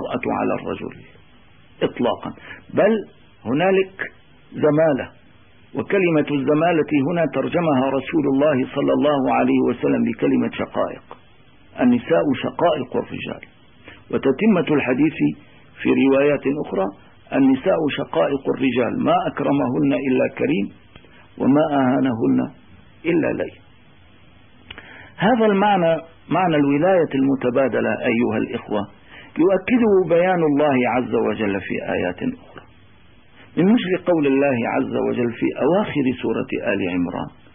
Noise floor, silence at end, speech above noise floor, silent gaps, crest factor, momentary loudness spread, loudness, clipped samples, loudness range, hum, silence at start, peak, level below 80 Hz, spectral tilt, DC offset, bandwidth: -52 dBFS; 0.25 s; 33 dB; none; 14 dB; 12 LU; -20 LUFS; under 0.1%; 4 LU; none; 0 s; -6 dBFS; -56 dBFS; -11.5 dB/octave; 0.2%; 3.7 kHz